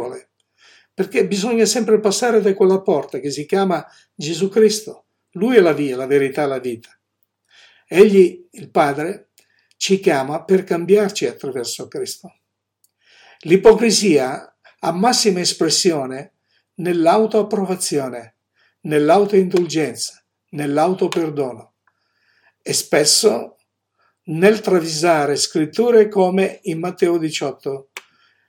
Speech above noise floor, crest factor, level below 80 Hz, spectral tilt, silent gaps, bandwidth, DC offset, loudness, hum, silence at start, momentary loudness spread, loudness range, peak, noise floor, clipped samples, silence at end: 53 dB; 18 dB; -60 dBFS; -4 dB/octave; none; 17.5 kHz; under 0.1%; -17 LUFS; none; 0 s; 15 LU; 3 LU; 0 dBFS; -69 dBFS; under 0.1%; 0.5 s